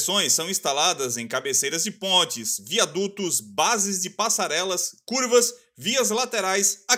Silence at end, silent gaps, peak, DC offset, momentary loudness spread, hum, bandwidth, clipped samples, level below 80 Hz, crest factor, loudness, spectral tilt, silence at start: 0 s; none; -6 dBFS; under 0.1%; 6 LU; none; 16 kHz; under 0.1%; -76 dBFS; 18 dB; -22 LUFS; -1 dB/octave; 0 s